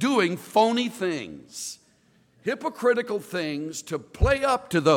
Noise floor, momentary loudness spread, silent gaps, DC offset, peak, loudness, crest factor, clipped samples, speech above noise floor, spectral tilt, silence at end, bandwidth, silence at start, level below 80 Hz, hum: -62 dBFS; 13 LU; none; under 0.1%; -6 dBFS; -26 LUFS; 18 dB; under 0.1%; 37 dB; -5 dB/octave; 0 s; 18 kHz; 0 s; -38 dBFS; none